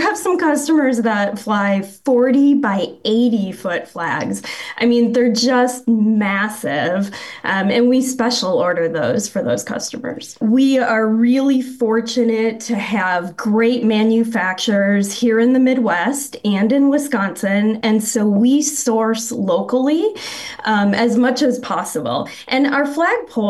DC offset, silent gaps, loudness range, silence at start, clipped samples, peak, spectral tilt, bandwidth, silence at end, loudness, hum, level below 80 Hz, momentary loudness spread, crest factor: under 0.1%; none; 2 LU; 0 s; under 0.1%; -6 dBFS; -4.5 dB/octave; 12.5 kHz; 0 s; -17 LUFS; none; -62 dBFS; 8 LU; 10 dB